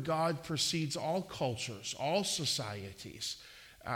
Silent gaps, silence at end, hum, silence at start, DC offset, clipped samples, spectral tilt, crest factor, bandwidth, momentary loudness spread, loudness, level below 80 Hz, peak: none; 0 s; none; 0 s; under 0.1%; under 0.1%; -3.5 dB/octave; 18 dB; 17.5 kHz; 13 LU; -35 LUFS; -66 dBFS; -20 dBFS